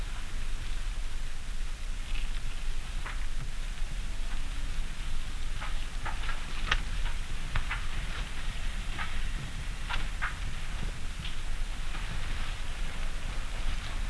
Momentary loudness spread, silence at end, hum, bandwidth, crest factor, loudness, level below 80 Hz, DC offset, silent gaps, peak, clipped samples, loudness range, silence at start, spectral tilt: 5 LU; 0 s; none; 11 kHz; 20 dB; -38 LUFS; -32 dBFS; under 0.1%; none; -10 dBFS; under 0.1%; 4 LU; 0 s; -3.5 dB/octave